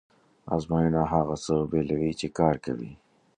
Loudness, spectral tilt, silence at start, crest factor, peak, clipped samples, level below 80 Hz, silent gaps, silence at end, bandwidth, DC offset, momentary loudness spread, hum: -27 LUFS; -7 dB/octave; 0.45 s; 20 dB; -8 dBFS; under 0.1%; -48 dBFS; none; 0.4 s; 9.8 kHz; under 0.1%; 8 LU; none